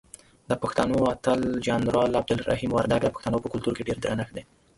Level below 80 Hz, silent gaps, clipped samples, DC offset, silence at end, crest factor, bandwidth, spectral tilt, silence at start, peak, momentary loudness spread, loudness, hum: -48 dBFS; none; under 0.1%; under 0.1%; 0.35 s; 22 dB; 11.5 kHz; -6 dB/octave; 0.5 s; -4 dBFS; 6 LU; -26 LUFS; none